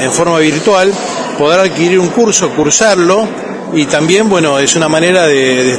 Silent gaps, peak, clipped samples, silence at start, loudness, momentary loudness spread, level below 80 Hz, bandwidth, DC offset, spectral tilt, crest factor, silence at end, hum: none; 0 dBFS; 0.1%; 0 s; -9 LUFS; 6 LU; -48 dBFS; 11 kHz; under 0.1%; -3.5 dB/octave; 10 dB; 0 s; none